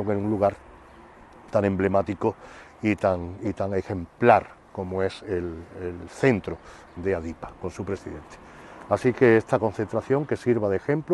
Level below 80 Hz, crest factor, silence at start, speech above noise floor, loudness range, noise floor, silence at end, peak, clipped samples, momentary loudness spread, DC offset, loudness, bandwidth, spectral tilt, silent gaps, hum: -52 dBFS; 24 dB; 0 s; 24 dB; 5 LU; -49 dBFS; 0 s; -2 dBFS; under 0.1%; 20 LU; under 0.1%; -25 LUFS; 11.5 kHz; -7.5 dB/octave; none; none